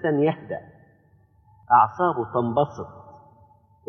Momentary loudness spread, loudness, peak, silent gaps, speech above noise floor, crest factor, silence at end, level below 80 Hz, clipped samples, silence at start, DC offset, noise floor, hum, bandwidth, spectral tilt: 17 LU; -22 LUFS; -4 dBFS; none; 37 dB; 20 dB; 0.85 s; -62 dBFS; under 0.1%; 0 s; under 0.1%; -59 dBFS; none; 6.4 kHz; -8.5 dB/octave